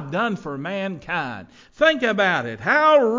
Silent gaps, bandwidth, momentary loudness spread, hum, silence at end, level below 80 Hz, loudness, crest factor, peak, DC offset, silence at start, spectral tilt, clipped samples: none; 7.6 kHz; 13 LU; none; 0 s; -58 dBFS; -20 LUFS; 16 dB; -4 dBFS; under 0.1%; 0 s; -5.5 dB/octave; under 0.1%